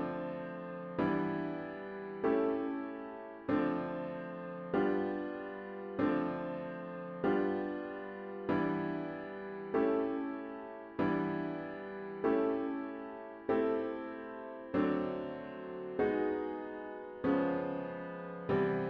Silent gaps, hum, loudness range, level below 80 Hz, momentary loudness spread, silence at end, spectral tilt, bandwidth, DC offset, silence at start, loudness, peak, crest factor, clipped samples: none; none; 2 LU; -68 dBFS; 11 LU; 0 s; -9.5 dB/octave; 5.4 kHz; under 0.1%; 0 s; -37 LUFS; -20 dBFS; 16 dB; under 0.1%